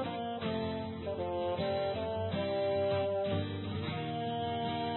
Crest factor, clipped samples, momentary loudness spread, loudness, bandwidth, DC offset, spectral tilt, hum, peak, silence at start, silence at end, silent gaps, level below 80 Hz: 12 dB; under 0.1%; 6 LU; -35 LUFS; 4.2 kHz; under 0.1%; -5 dB/octave; none; -22 dBFS; 0 s; 0 s; none; -54 dBFS